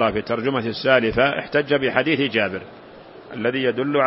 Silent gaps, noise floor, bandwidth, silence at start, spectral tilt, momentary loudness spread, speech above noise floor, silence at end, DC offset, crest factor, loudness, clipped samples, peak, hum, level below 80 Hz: none; -41 dBFS; 5.8 kHz; 0 s; -9.5 dB/octave; 8 LU; 21 dB; 0 s; under 0.1%; 20 dB; -20 LUFS; under 0.1%; 0 dBFS; none; -50 dBFS